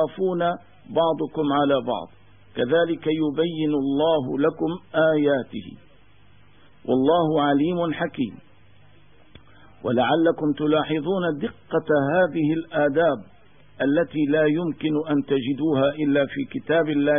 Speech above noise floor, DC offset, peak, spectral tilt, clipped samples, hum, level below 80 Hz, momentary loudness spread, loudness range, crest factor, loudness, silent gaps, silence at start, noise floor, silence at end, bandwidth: 33 dB; 0.3%; -8 dBFS; -11 dB/octave; under 0.1%; none; -60 dBFS; 9 LU; 2 LU; 14 dB; -23 LUFS; none; 0 s; -55 dBFS; 0 s; 3.7 kHz